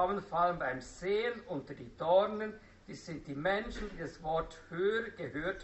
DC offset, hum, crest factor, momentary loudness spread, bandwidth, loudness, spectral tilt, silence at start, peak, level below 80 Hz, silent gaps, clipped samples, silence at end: under 0.1%; none; 18 dB; 15 LU; 8 kHz; -35 LUFS; -3.5 dB/octave; 0 s; -16 dBFS; -56 dBFS; none; under 0.1%; 0 s